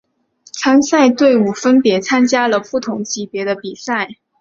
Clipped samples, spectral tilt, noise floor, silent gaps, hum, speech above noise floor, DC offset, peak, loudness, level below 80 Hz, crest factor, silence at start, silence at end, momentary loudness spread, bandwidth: under 0.1%; -4 dB/octave; -50 dBFS; none; none; 36 dB; under 0.1%; -2 dBFS; -15 LUFS; -60 dBFS; 14 dB; 0.55 s; 0.3 s; 11 LU; 7.4 kHz